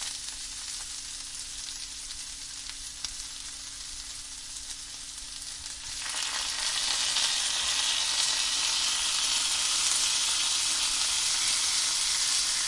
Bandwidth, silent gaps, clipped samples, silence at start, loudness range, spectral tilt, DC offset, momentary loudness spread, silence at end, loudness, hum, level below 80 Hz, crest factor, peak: 11.5 kHz; none; under 0.1%; 0 s; 12 LU; 2.5 dB/octave; under 0.1%; 13 LU; 0 s; -27 LUFS; none; -54 dBFS; 22 dB; -8 dBFS